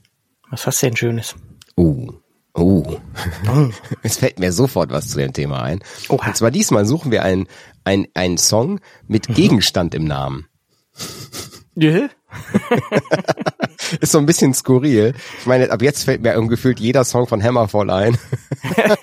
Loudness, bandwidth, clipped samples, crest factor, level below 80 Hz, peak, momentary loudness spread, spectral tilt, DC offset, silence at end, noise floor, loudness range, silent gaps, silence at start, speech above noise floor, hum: -17 LUFS; 16 kHz; under 0.1%; 16 dB; -44 dBFS; -2 dBFS; 13 LU; -5 dB/octave; under 0.1%; 0 s; -58 dBFS; 4 LU; none; 0.5 s; 41 dB; none